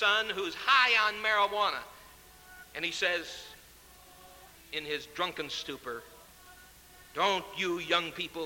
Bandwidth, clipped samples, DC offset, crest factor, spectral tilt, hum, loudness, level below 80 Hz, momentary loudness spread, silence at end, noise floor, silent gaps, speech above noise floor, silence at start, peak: 17 kHz; under 0.1%; under 0.1%; 22 dB; -2 dB/octave; none; -29 LUFS; -64 dBFS; 18 LU; 0 s; -55 dBFS; none; 25 dB; 0 s; -12 dBFS